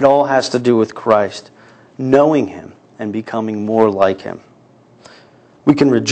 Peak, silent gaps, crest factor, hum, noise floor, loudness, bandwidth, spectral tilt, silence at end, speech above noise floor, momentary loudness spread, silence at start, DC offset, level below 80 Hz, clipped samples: 0 dBFS; none; 14 dB; none; -47 dBFS; -15 LUFS; 9 kHz; -6 dB/octave; 0 s; 33 dB; 15 LU; 0 s; under 0.1%; -56 dBFS; under 0.1%